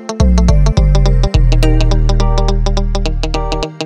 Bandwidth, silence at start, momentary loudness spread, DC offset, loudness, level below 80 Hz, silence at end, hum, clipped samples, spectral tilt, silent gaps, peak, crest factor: 9 kHz; 0 s; 7 LU; 4%; -14 LUFS; -12 dBFS; 0 s; none; under 0.1%; -6.5 dB/octave; none; 0 dBFS; 10 dB